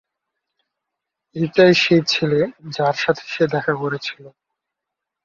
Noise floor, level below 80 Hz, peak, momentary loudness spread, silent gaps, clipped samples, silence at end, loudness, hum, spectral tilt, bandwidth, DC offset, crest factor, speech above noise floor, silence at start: -83 dBFS; -60 dBFS; -2 dBFS; 12 LU; none; under 0.1%; 0.95 s; -18 LUFS; none; -5.5 dB/octave; 7.4 kHz; under 0.1%; 18 dB; 65 dB; 1.35 s